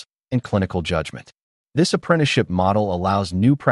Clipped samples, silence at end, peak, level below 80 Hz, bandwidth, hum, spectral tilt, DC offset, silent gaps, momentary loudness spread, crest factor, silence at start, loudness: under 0.1%; 0 s; -4 dBFS; -46 dBFS; 11.5 kHz; none; -6 dB/octave; under 0.1%; 1.42-1.65 s; 8 LU; 16 dB; 0.3 s; -20 LUFS